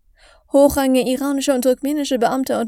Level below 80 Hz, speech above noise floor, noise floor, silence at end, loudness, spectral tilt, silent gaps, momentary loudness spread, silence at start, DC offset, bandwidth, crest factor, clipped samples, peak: -46 dBFS; 35 dB; -51 dBFS; 0 s; -17 LUFS; -4 dB/octave; none; 6 LU; 0.55 s; under 0.1%; 17 kHz; 18 dB; under 0.1%; 0 dBFS